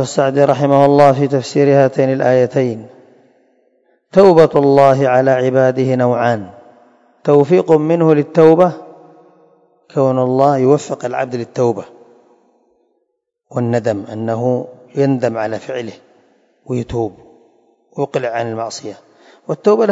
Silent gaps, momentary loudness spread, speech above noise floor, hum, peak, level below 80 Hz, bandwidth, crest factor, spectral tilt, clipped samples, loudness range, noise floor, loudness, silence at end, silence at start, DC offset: none; 15 LU; 57 dB; none; 0 dBFS; -54 dBFS; 8.2 kHz; 14 dB; -7 dB/octave; 0.3%; 10 LU; -70 dBFS; -14 LUFS; 0 s; 0 s; under 0.1%